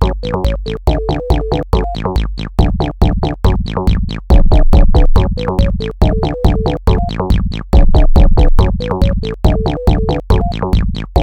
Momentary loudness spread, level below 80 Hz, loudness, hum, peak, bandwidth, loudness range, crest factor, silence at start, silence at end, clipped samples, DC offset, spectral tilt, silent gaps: 6 LU; -12 dBFS; -15 LUFS; none; 0 dBFS; 6.6 kHz; 2 LU; 10 dB; 0 s; 0 s; 0.6%; 0.6%; -8 dB/octave; none